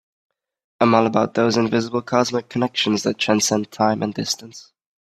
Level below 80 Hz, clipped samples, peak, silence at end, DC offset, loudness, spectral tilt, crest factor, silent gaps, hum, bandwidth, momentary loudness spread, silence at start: -62 dBFS; under 0.1%; 0 dBFS; 0.4 s; under 0.1%; -20 LUFS; -4 dB/octave; 20 dB; none; none; 14.5 kHz; 7 LU; 0.8 s